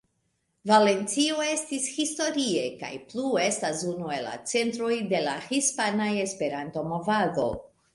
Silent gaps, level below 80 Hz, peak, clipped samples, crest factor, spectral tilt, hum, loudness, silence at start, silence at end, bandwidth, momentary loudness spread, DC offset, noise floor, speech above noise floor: none; -62 dBFS; -6 dBFS; under 0.1%; 20 dB; -3 dB/octave; none; -27 LUFS; 0.65 s; 0.3 s; 11.5 kHz; 9 LU; under 0.1%; -75 dBFS; 48 dB